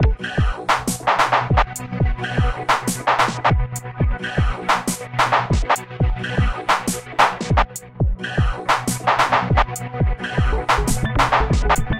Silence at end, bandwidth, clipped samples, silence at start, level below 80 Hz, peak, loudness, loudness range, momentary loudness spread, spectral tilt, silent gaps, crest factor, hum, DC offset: 0 s; 16.5 kHz; under 0.1%; 0 s; -26 dBFS; 0 dBFS; -20 LUFS; 1 LU; 6 LU; -4.5 dB/octave; none; 18 dB; none; under 0.1%